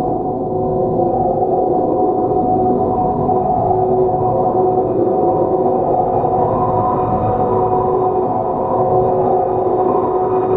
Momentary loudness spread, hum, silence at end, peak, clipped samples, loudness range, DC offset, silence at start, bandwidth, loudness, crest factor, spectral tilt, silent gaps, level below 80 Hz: 2 LU; none; 0 s; -4 dBFS; under 0.1%; 1 LU; under 0.1%; 0 s; 3.9 kHz; -15 LUFS; 12 dB; -12.5 dB/octave; none; -38 dBFS